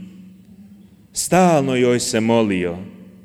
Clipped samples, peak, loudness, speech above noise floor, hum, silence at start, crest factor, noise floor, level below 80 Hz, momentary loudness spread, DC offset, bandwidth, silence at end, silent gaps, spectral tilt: under 0.1%; -4 dBFS; -17 LUFS; 29 dB; none; 0 s; 16 dB; -46 dBFS; -54 dBFS; 14 LU; under 0.1%; 16.5 kHz; 0.2 s; none; -5 dB/octave